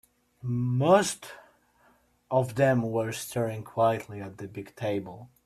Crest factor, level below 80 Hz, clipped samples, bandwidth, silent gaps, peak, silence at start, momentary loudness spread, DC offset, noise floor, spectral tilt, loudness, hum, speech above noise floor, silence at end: 20 dB; -64 dBFS; under 0.1%; 14.5 kHz; none; -8 dBFS; 0.45 s; 18 LU; under 0.1%; -64 dBFS; -6 dB/octave; -27 LUFS; none; 37 dB; 0.2 s